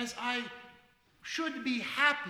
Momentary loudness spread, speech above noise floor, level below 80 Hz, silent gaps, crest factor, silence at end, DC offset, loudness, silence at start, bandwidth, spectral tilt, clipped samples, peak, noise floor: 19 LU; 31 dB; -74 dBFS; none; 22 dB; 0 s; under 0.1%; -33 LUFS; 0 s; 16.5 kHz; -2 dB/octave; under 0.1%; -12 dBFS; -64 dBFS